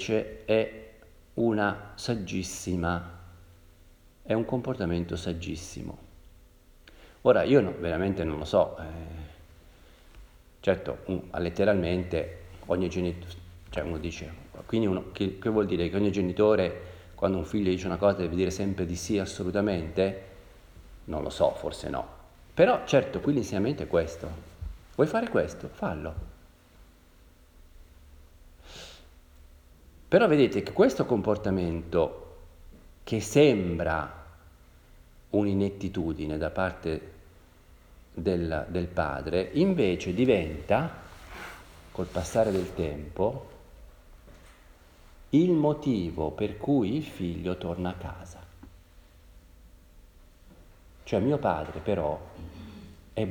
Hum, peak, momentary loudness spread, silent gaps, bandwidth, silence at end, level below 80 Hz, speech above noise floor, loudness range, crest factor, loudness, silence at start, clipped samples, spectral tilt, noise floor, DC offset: none; -8 dBFS; 19 LU; none; over 20 kHz; 0 s; -50 dBFS; 29 dB; 6 LU; 22 dB; -28 LUFS; 0 s; under 0.1%; -6.5 dB/octave; -56 dBFS; under 0.1%